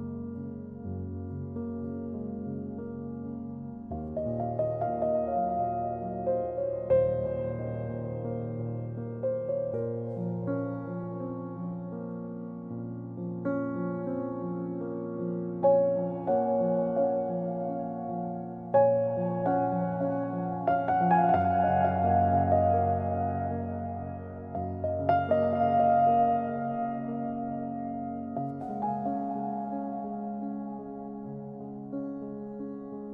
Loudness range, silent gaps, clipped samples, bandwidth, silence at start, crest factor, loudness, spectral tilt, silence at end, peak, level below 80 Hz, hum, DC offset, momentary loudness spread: 10 LU; none; under 0.1%; 3.8 kHz; 0 s; 18 dB; -30 LUFS; -11.5 dB/octave; 0 s; -12 dBFS; -62 dBFS; none; under 0.1%; 14 LU